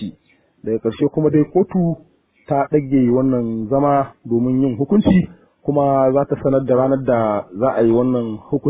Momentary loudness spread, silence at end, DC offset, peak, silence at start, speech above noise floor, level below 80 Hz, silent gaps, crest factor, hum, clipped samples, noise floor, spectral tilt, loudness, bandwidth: 7 LU; 0 s; under 0.1%; -2 dBFS; 0 s; 39 dB; -46 dBFS; none; 14 dB; none; under 0.1%; -56 dBFS; -12.5 dB/octave; -17 LUFS; 4 kHz